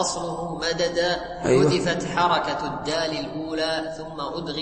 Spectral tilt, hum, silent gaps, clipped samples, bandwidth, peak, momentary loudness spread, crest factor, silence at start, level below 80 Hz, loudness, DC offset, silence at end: -4.5 dB/octave; none; none; under 0.1%; 8.8 kHz; -8 dBFS; 10 LU; 18 dB; 0 s; -48 dBFS; -24 LUFS; under 0.1%; 0 s